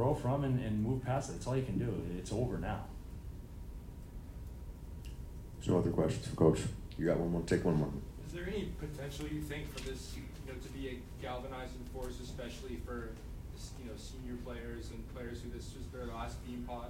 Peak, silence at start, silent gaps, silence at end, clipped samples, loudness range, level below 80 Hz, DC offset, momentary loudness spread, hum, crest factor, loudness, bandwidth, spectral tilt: -14 dBFS; 0 s; none; 0 s; under 0.1%; 11 LU; -48 dBFS; under 0.1%; 16 LU; none; 24 dB; -39 LUFS; 16 kHz; -7 dB/octave